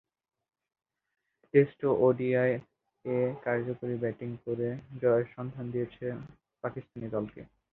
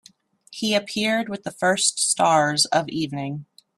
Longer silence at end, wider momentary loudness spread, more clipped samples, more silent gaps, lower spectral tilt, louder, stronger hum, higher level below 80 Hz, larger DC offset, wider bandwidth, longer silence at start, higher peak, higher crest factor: about the same, 0.25 s vs 0.35 s; about the same, 13 LU vs 13 LU; neither; neither; first, -11 dB/octave vs -2.5 dB/octave; second, -31 LUFS vs -21 LUFS; neither; about the same, -66 dBFS vs -66 dBFS; neither; second, 4.1 kHz vs 15 kHz; first, 1.55 s vs 0.5 s; second, -10 dBFS vs -6 dBFS; about the same, 22 dB vs 18 dB